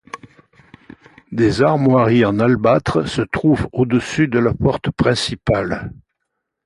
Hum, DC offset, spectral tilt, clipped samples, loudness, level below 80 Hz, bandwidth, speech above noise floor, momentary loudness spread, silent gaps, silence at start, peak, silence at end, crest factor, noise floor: none; under 0.1%; -6.5 dB/octave; under 0.1%; -17 LUFS; -40 dBFS; 11.5 kHz; 60 dB; 11 LU; none; 0.15 s; -2 dBFS; 0.7 s; 14 dB; -76 dBFS